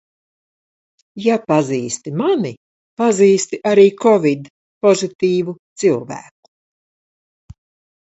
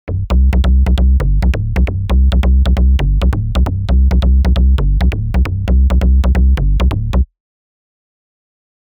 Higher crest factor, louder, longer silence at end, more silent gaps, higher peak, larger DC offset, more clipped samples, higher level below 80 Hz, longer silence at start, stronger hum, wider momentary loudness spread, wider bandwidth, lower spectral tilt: first, 18 dB vs 8 dB; about the same, -16 LUFS vs -14 LUFS; about the same, 1.8 s vs 1.75 s; first, 2.57-2.97 s, 4.50-4.81 s, 5.15-5.19 s, 5.59-5.76 s vs none; about the same, 0 dBFS vs -2 dBFS; neither; neither; second, -60 dBFS vs -12 dBFS; first, 1.15 s vs 0.05 s; neither; first, 12 LU vs 4 LU; first, 8.2 kHz vs 5 kHz; second, -5.5 dB/octave vs -8 dB/octave